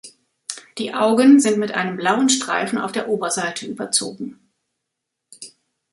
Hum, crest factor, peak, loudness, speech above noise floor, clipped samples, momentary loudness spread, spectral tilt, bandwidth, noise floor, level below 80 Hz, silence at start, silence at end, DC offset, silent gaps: none; 18 dB; -2 dBFS; -18 LUFS; 62 dB; under 0.1%; 21 LU; -3 dB/octave; 11.5 kHz; -80 dBFS; -68 dBFS; 0.05 s; 0.45 s; under 0.1%; none